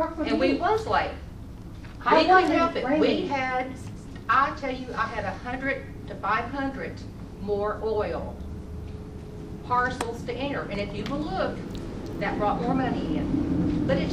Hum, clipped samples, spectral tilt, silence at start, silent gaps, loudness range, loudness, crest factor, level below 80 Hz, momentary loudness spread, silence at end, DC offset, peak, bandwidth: none; under 0.1%; -6.5 dB/octave; 0 s; none; 7 LU; -26 LUFS; 20 dB; -42 dBFS; 16 LU; 0 s; under 0.1%; -6 dBFS; 12.5 kHz